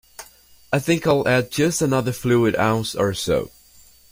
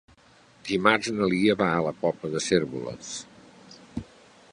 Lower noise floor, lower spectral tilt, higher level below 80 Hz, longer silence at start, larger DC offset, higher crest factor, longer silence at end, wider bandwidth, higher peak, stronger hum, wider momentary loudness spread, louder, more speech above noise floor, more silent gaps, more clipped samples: second, -50 dBFS vs -56 dBFS; about the same, -5 dB/octave vs -4.5 dB/octave; first, -50 dBFS vs -58 dBFS; second, 0.2 s vs 0.65 s; neither; second, 16 dB vs 26 dB; first, 0.65 s vs 0.5 s; first, 16.5 kHz vs 11.5 kHz; about the same, -4 dBFS vs -2 dBFS; neither; second, 7 LU vs 17 LU; first, -20 LUFS vs -25 LUFS; about the same, 31 dB vs 32 dB; neither; neither